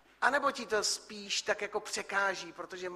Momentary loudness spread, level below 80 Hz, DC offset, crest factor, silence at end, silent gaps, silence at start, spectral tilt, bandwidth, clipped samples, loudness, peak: 9 LU; -74 dBFS; under 0.1%; 24 dB; 0 s; none; 0.2 s; -1 dB/octave; 13.5 kHz; under 0.1%; -33 LUFS; -10 dBFS